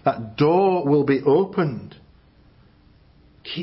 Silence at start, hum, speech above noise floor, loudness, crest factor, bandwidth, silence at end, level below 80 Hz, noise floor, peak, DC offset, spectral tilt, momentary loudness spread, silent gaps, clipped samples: 0.05 s; none; 34 dB; -20 LUFS; 16 dB; 5.8 kHz; 0 s; -56 dBFS; -53 dBFS; -6 dBFS; under 0.1%; -11.5 dB/octave; 15 LU; none; under 0.1%